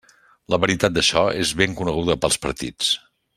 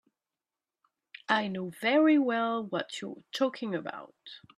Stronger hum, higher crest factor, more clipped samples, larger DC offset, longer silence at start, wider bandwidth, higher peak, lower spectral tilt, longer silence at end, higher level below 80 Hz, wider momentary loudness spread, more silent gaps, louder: neither; about the same, 20 dB vs 20 dB; neither; neither; second, 0.5 s vs 1.3 s; first, 16 kHz vs 13.5 kHz; first, -2 dBFS vs -10 dBFS; second, -3 dB/octave vs -5 dB/octave; first, 0.4 s vs 0.2 s; first, -44 dBFS vs -80 dBFS; second, 6 LU vs 21 LU; neither; first, -20 LUFS vs -29 LUFS